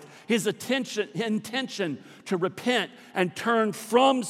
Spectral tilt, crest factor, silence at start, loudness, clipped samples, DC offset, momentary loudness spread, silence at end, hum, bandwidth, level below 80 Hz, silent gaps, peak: -4 dB/octave; 20 dB; 0 s; -27 LUFS; under 0.1%; under 0.1%; 8 LU; 0 s; none; 16 kHz; -80 dBFS; none; -8 dBFS